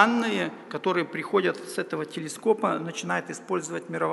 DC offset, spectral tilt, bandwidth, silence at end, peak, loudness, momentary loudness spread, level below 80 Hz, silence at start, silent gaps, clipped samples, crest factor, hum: under 0.1%; -4.5 dB/octave; 11.5 kHz; 0 s; -4 dBFS; -28 LUFS; 7 LU; -80 dBFS; 0 s; none; under 0.1%; 22 dB; none